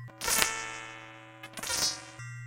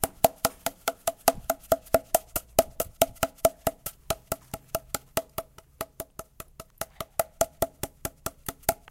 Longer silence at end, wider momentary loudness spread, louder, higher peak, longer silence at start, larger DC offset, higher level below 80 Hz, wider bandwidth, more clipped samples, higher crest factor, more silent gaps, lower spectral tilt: second, 0 s vs 0.15 s; first, 20 LU vs 14 LU; about the same, -30 LUFS vs -29 LUFS; about the same, 0 dBFS vs 0 dBFS; about the same, 0 s vs 0 s; neither; second, -58 dBFS vs -50 dBFS; about the same, 17 kHz vs 17 kHz; neither; about the same, 34 dB vs 30 dB; neither; second, -0.5 dB/octave vs -3 dB/octave